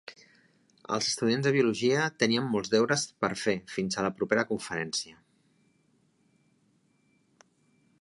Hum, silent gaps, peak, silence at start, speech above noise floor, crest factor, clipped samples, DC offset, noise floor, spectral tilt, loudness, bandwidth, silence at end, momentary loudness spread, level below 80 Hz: none; none; -10 dBFS; 0.1 s; 41 dB; 22 dB; under 0.1%; under 0.1%; -69 dBFS; -4 dB/octave; -28 LUFS; 11.5 kHz; 2.9 s; 7 LU; -68 dBFS